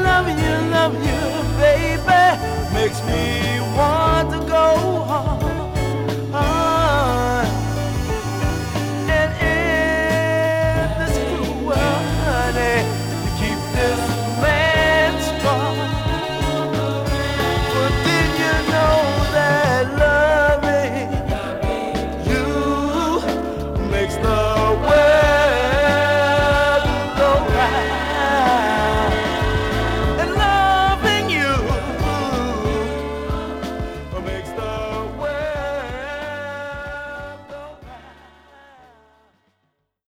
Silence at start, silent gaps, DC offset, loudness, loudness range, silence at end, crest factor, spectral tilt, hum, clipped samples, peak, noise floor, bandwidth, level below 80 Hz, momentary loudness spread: 0 s; none; under 0.1%; -18 LUFS; 10 LU; 1.95 s; 18 dB; -5.5 dB/octave; none; under 0.1%; -2 dBFS; -70 dBFS; 20 kHz; -28 dBFS; 10 LU